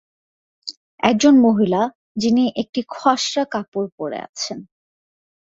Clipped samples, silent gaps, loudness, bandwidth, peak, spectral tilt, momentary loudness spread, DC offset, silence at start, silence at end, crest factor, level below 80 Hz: under 0.1%; 0.77-0.98 s, 1.95-2.15 s, 2.69-2.73 s, 3.68-3.72 s, 3.92-3.98 s, 4.29-4.33 s; -19 LUFS; 7.8 kHz; 0 dBFS; -4.5 dB/octave; 20 LU; under 0.1%; 0.65 s; 0.95 s; 20 dB; -60 dBFS